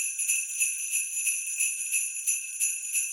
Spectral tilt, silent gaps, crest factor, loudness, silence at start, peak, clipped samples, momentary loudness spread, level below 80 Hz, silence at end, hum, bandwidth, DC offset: 10.5 dB/octave; none; 18 dB; -26 LUFS; 0 s; -12 dBFS; under 0.1%; 2 LU; under -90 dBFS; 0 s; none; 17 kHz; under 0.1%